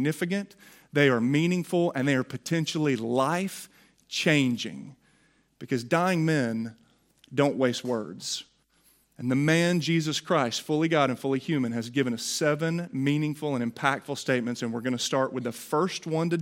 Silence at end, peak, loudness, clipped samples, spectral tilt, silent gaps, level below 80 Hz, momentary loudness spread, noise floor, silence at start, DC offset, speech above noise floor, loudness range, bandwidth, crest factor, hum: 0 s; -6 dBFS; -27 LUFS; under 0.1%; -5 dB/octave; none; -72 dBFS; 10 LU; -65 dBFS; 0 s; under 0.1%; 39 dB; 3 LU; 16.5 kHz; 20 dB; none